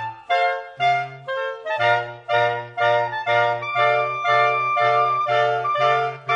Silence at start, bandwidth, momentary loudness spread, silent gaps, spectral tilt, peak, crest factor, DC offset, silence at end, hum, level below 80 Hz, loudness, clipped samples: 0 s; 8.2 kHz; 6 LU; none; -4.5 dB/octave; -6 dBFS; 14 dB; under 0.1%; 0 s; none; -70 dBFS; -20 LUFS; under 0.1%